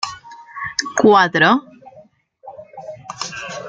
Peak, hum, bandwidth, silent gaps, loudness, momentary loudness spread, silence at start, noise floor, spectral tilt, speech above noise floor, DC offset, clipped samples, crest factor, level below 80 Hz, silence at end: 0 dBFS; none; 9.2 kHz; none; -16 LUFS; 24 LU; 0 s; -48 dBFS; -3.5 dB/octave; 34 dB; under 0.1%; under 0.1%; 20 dB; -60 dBFS; 0 s